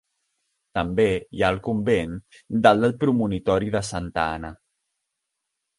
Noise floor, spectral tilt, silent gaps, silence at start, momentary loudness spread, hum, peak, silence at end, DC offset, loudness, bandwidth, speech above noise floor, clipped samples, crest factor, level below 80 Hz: -81 dBFS; -6 dB/octave; none; 0.75 s; 13 LU; none; -2 dBFS; 1.25 s; under 0.1%; -23 LUFS; 11.5 kHz; 58 dB; under 0.1%; 22 dB; -46 dBFS